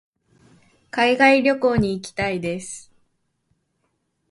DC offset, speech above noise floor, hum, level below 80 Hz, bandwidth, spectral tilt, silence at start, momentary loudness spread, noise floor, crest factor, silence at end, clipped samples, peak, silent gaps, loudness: under 0.1%; 52 dB; none; -48 dBFS; 11.5 kHz; -5 dB/octave; 0.95 s; 16 LU; -72 dBFS; 22 dB; 1.5 s; under 0.1%; -2 dBFS; none; -19 LUFS